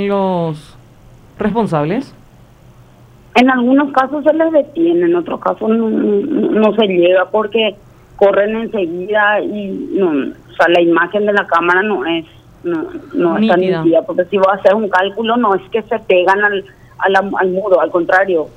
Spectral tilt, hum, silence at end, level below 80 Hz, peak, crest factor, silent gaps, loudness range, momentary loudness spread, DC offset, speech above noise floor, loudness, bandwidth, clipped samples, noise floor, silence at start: -7 dB/octave; none; 0.05 s; -50 dBFS; 0 dBFS; 14 dB; none; 2 LU; 9 LU; under 0.1%; 29 dB; -14 LUFS; 9.4 kHz; under 0.1%; -42 dBFS; 0 s